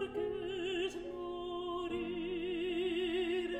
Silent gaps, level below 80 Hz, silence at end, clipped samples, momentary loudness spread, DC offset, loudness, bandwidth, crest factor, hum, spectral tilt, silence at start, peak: none; -60 dBFS; 0 s; under 0.1%; 6 LU; under 0.1%; -38 LUFS; 9 kHz; 12 dB; none; -5 dB/octave; 0 s; -26 dBFS